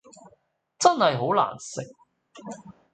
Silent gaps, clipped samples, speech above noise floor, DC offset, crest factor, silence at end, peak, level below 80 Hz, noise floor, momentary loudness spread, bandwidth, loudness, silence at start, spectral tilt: none; under 0.1%; 39 dB; under 0.1%; 24 dB; 0.2 s; -2 dBFS; -72 dBFS; -64 dBFS; 23 LU; 9.4 kHz; -23 LUFS; 0.8 s; -4 dB/octave